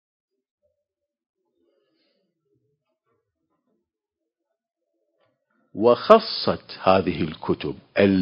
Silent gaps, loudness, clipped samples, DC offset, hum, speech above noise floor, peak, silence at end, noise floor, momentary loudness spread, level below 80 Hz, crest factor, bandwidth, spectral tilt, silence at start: none; -21 LUFS; under 0.1%; under 0.1%; none; 65 dB; 0 dBFS; 0 s; -85 dBFS; 12 LU; -54 dBFS; 26 dB; 8 kHz; -8 dB/octave; 5.75 s